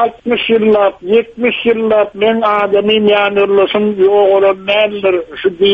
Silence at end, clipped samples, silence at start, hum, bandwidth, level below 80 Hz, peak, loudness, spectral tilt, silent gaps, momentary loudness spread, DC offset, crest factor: 0 s; under 0.1%; 0 s; none; 4.9 kHz; -50 dBFS; 0 dBFS; -12 LUFS; -7 dB/octave; none; 5 LU; under 0.1%; 10 dB